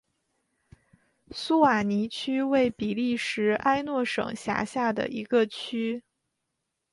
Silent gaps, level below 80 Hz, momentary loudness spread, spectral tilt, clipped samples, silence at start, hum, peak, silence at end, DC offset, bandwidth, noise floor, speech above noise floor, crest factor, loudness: none; -64 dBFS; 8 LU; -5 dB/octave; under 0.1%; 1.3 s; none; -8 dBFS; 0.9 s; under 0.1%; 11.5 kHz; -81 dBFS; 55 dB; 20 dB; -27 LUFS